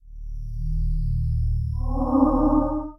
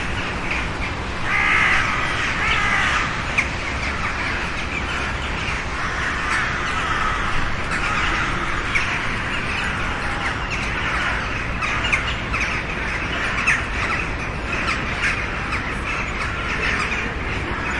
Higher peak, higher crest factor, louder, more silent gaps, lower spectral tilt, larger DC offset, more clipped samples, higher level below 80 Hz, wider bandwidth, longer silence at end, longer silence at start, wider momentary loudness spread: about the same, -6 dBFS vs -4 dBFS; about the same, 16 dB vs 18 dB; second, -24 LUFS vs -21 LUFS; neither; first, -12 dB/octave vs -4 dB/octave; neither; neither; first, -26 dBFS vs -32 dBFS; second, 5.6 kHz vs 11.5 kHz; about the same, 0.05 s vs 0 s; about the same, 0.05 s vs 0 s; first, 15 LU vs 6 LU